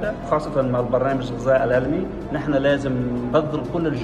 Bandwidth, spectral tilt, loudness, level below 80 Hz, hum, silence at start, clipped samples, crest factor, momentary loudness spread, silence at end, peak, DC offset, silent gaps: 10.5 kHz; -7.5 dB/octave; -22 LUFS; -40 dBFS; none; 0 s; under 0.1%; 16 dB; 5 LU; 0 s; -6 dBFS; under 0.1%; none